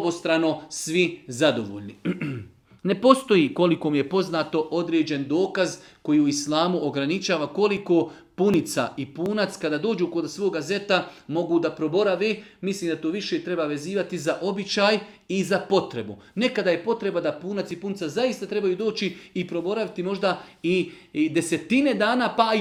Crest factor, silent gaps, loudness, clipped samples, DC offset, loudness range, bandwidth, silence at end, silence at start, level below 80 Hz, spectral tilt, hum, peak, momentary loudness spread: 24 dB; none; -24 LUFS; under 0.1%; under 0.1%; 4 LU; 15 kHz; 0 s; 0 s; -66 dBFS; -5 dB/octave; none; 0 dBFS; 9 LU